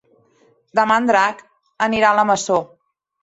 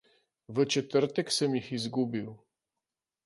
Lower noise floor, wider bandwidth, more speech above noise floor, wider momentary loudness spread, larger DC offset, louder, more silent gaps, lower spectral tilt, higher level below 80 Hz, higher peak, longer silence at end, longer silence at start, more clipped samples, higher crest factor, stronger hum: second, -58 dBFS vs -89 dBFS; second, 8.2 kHz vs 11.5 kHz; second, 41 dB vs 60 dB; about the same, 8 LU vs 9 LU; neither; first, -17 LUFS vs -30 LUFS; neither; about the same, -3.5 dB/octave vs -4.5 dB/octave; first, -60 dBFS vs -74 dBFS; first, -2 dBFS vs -14 dBFS; second, 0.6 s vs 0.9 s; first, 0.75 s vs 0.5 s; neither; about the same, 18 dB vs 20 dB; neither